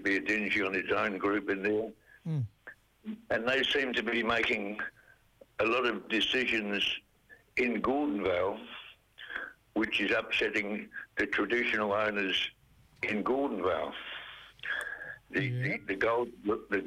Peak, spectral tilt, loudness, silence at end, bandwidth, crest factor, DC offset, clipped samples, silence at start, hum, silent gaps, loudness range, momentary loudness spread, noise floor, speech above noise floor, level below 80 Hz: -20 dBFS; -5 dB/octave; -31 LUFS; 0 s; 15.5 kHz; 14 dB; under 0.1%; under 0.1%; 0 s; none; none; 3 LU; 13 LU; -61 dBFS; 30 dB; -64 dBFS